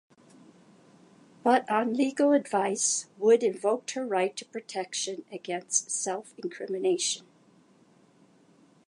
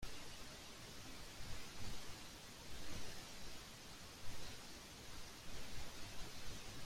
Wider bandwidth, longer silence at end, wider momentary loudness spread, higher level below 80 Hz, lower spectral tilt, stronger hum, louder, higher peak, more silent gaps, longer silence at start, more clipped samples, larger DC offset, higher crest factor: second, 11.5 kHz vs 16 kHz; first, 1.7 s vs 0 s; first, 12 LU vs 3 LU; second, -86 dBFS vs -58 dBFS; about the same, -2.5 dB/octave vs -2.5 dB/octave; neither; first, -28 LUFS vs -53 LUFS; first, -8 dBFS vs -32 dBFS; neither; first, 1.45 s vs 0 s; neither; neither; first, 20 dB vs 14 dB